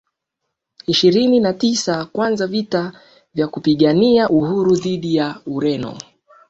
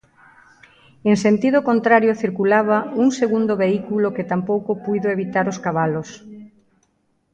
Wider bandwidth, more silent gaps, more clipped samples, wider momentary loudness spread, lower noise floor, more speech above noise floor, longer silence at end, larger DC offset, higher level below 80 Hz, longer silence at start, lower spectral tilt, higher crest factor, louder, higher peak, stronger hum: about the same, 8.2 kHz vs 9 kHz; neither; neither; first, 11 LU vs 7 LU; first, -78 dBFS vs -65 dBFS; first, 61 dB vs 47 dB; second, 0.5 s vs 0.85 s; neither; first, -56 dBFS vs -62 dBFS; second, 0.9 s vs 1.05 s; about the same, -5.5 dB/octave vs -6.5 dB/octave; about the same, 16 dB vs 18 dB; about the same, -17 LUFS vs -19 LUFS; about the same, -2 dBFS vs -2 dBFS; neither